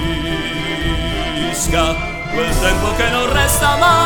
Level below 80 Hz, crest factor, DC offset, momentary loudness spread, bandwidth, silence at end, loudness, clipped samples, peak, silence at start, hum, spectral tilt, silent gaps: -24 dBFS; 16 dB; under 0.1%; 7 LU; 19 kHz; 0 s; -16 LUFS; under 0.1%; 0 dBFS; 0 s; none; -3.5 dB/octave; none